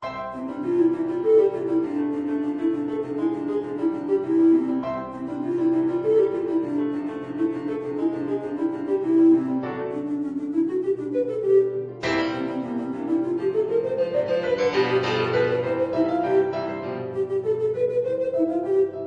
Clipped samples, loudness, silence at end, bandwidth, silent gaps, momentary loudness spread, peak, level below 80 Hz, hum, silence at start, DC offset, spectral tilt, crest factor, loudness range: under 0.1%; -24 LUFS; 0 s; 7.4 kHz; none; 9 LU; -8 dBFS; -62 dBFS; none; 0 s; under 0.1%; -7.5 dB/octave; 14 dB; 2 LU